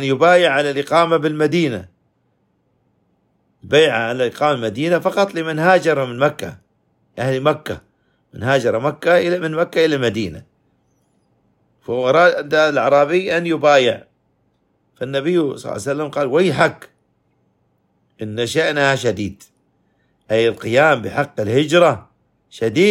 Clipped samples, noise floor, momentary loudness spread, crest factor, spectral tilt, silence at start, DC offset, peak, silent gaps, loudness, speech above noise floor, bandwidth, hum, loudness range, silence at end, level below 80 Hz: under 0.1%; -64 dBFS; 12 LU; 18 dB; -5.5 dB/octave; 0 s; under 0.1%; 0 dBFS; none; -17 LUFS; 48 dB; 16 kHz; none; 5 LU; 0 s; -58 dBFS